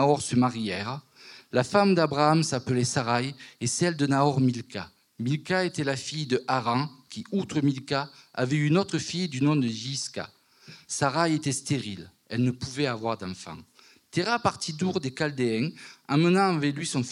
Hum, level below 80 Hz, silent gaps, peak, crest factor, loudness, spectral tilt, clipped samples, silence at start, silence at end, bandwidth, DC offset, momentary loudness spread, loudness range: none; -68 dBFS; none; -6 dBFS; 20 dB; -27 LUFS; -5 dB/octave; under 0.1%; 0 s; 0 s; 12 kHz; under 0.1%; 13 LU; 5 LU